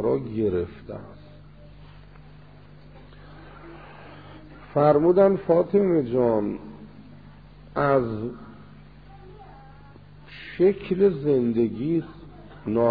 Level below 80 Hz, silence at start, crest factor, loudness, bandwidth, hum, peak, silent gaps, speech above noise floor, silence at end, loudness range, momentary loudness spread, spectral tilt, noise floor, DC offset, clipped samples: -52 dBFS; 0 s; 18 dB; -23 LUFS; 5 kHz; 50 Hz at -50 dBFS; -6 dBFS; none; 26 dB; 0 s; 10 LU; 26 LU; -11.5 dB/octave; -48 dBFS; 0.2%; under 0.1%